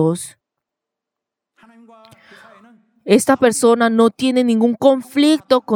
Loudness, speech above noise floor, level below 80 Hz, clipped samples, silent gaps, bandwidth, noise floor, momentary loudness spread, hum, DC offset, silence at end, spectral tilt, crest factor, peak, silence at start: -15 LUFS; 69 dB; -64 dBFS; under 0.1%; none; 17 kHz; -83 dBFS; 7 LU; none; under 0.1%; 0 s; -4.5 dB/octave; 16 dB; 0 dBFS; 0 s